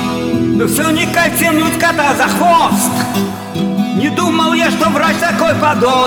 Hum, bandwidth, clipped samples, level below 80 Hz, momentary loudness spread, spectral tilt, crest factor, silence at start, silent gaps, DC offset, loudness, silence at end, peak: none; over 20 kHz; under 0.1%; -46 dBFS; 6 LU; -4 dB/octave; 12 dB; 0 s; none; under 0.1%; -12 LUFS; 0 s; 0 dBFS